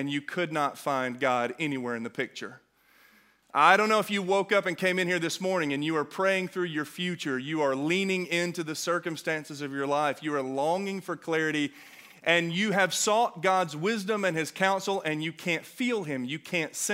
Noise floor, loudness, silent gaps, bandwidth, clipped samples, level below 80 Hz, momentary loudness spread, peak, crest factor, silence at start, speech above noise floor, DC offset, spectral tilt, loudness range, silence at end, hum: -62 dBFS; -28 LUFS; none; 16 kHz; under 0.1%; -80 dBFS; 8 LU; -4 dBFS; 24 dB; 0 s; 33 dB; under 0.1%; -4 dB/octave; 4 LU; 0 s; none